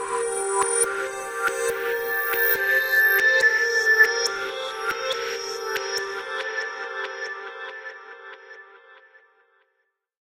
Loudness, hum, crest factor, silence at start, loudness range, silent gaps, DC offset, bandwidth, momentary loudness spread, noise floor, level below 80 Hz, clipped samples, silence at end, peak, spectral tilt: -22 LUFS; none; 20 dB; 0 s; 15 LU; none; under 0.1%; 16 kHz; 18 LU; -74 dBFS; -66 dBFS; under 0.1%; 1.3 s; -4 dBFS; 0.5 dB/octave